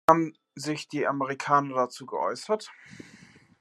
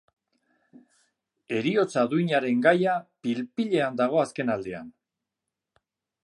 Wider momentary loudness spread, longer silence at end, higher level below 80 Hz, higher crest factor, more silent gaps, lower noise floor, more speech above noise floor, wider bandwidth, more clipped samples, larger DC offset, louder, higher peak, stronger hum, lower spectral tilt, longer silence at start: first, 23 LU vs 10 LU; second, 0.6 s vs 1.35 s; about the same, -70 dBFS vs -72 dBFS; first, 26 dB vs 20 dB; neither; second, -54 dBFS vs -86 dBFS; second, 27 dB vs 61 dB; first, 13 kHz vs 11 kHz; neither; neither; second, -28 LUFS vs -25 LUFS; first, -2 dBFS vs -6 dBFS; neither; second, -5 dB/octave vs -6.5 dB/octave; second, 0.1 s vs 1.5 s